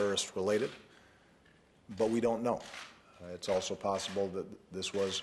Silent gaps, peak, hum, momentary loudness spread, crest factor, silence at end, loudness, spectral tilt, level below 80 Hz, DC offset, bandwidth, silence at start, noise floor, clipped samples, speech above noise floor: none; -18 dBFS; none; 17 LU; 16 dB; 0 s; -35 LUFS; -3.5 dB/octave; -68 dBFS; under 0.1%; 12.5 kHz; 0 s; -64 dBFS; under 0.1%; 30 dB